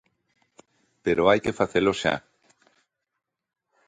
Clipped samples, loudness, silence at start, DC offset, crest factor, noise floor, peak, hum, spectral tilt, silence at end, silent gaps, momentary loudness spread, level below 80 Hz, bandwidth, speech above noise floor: under 0.1%; -24 LUFS; 1.05 s; under 0.1%; 22 dB; -71 dBFS; -6 dBFS; none; -5 dB/octave; 1.7 s; none; 10 LU; -56 dBFS; 9.6 kHz; 49 dB